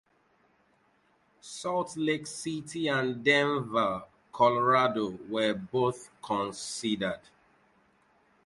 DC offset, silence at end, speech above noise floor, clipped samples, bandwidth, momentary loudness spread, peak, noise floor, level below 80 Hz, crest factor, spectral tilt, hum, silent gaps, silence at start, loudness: under 0.1%; 1.3 s; 39 dB; under 0.1%; 11.5 kHz; 12 LU; -10 dBFS; -68 dBFS; -68 dBFS; 20 dB; -4.5 dB/octave; none; none; 1.45 s; -29 LUFS